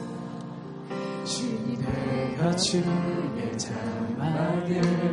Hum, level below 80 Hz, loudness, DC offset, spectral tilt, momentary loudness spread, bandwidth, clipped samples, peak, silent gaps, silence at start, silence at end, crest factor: none; -54 dBFS; -28 LUFS; under 0.1%; -5.5 dB/octave; 12 LU; 11.5 kHz; under 0.1%; -12 dBFS; none; 0 s; 0 s; 16 dB